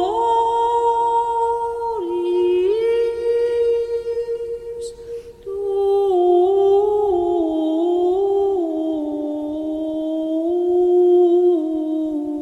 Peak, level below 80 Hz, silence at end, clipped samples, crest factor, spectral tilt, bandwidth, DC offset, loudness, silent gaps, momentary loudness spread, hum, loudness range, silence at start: -8 dBFS; -52 dBFS; 0 s; under 0.1%; 12 dB; -6.5 dB/octave; 9.2 kHz; under 0.1%; -19 LUFS; none; 10 LU; none; 3 LU; 0 s